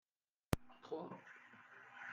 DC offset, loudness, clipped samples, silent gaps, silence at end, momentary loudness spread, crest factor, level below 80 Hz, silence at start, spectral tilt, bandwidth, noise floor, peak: under 0.1%; -48 LUFS; under 0.1%; none; 0 s; 15 LU; 34 dB; -62 dBFS; 0.5 s; -5.5 dB/octave; 7.2 kHz; -73 dBFS; -16 dBFS